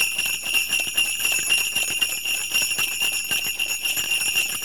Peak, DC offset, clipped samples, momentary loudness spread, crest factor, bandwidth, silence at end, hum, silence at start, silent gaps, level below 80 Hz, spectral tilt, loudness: -8 dBFS; 0.6%; under 0.1%; 3 LU; 16 dB; over 20 kHz; 0 s; none; 0 s; none; -56 dBFS; 2 dB/octave; -20 LUFS